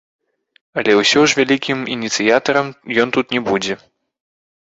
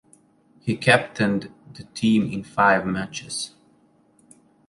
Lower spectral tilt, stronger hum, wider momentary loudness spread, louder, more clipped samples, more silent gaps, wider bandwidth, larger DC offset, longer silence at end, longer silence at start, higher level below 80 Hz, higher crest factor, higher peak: second, -3.5 dB/octave vs -5 dB/octave; neither; second, 9 LU vs 16 LU; first, -16 LUFS vs -22 LUFS; neither; neither; second, 8 kHz vs 11.5 kHz; neither; second, 0.9 s vs 1.2 s; about the same, 0.75 s vs 0.65 s; about the same, -58 dBFS vs -56 dBFS; second, 16 dB vs 22 dB; about the same, -2 dBFS vs -2 dBFS